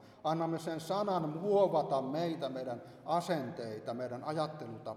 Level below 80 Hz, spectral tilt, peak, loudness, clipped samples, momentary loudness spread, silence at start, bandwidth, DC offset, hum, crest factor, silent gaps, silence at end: -78 dBFS; -6.5 dB/octave; -16 dBFS; -35 LUFS; under 0.1%; 11 LU; 0 s; 14.5 kHz; under 0.1%; none; 18 dB; none; 0 s